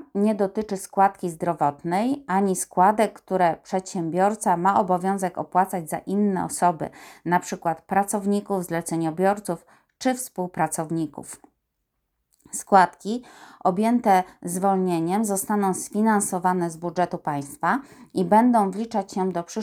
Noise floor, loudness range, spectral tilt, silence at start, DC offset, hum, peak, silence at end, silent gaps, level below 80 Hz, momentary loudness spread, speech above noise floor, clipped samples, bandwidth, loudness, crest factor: -77 dBFS; 4 LU; -5.5 dB/octave; 0 s; under 0.1%; none; -2 dBFS; 0 s; none; -64 dBFS; 10 LU; 54 dB; under 0.1%; 17.5 kHz; -23 LUFS; 20 dB